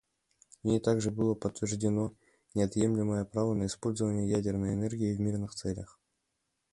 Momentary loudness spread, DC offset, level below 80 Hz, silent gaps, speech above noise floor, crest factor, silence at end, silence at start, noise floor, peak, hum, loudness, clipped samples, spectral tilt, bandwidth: 8 LU; under 0.1%; -56 dBFS; none; 51 dB; 18 dB; 0.9 s; 0.65 s; -82 dBFS; -14 dBFS; none; -32 LUFS; under 0.1%; -6.5 dB/octave; 11.5 kHz